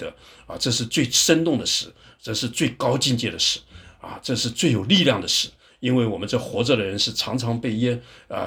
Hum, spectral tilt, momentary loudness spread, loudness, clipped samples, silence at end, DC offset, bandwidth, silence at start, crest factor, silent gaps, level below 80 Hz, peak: none; -3.5 dB/octave; 14 LU; -21 LUFS; under 0.1%; 0 s; under 0.1%; over 20 kHz; 0 s; 20 dB; none; -54 dBFS; -2 dBFS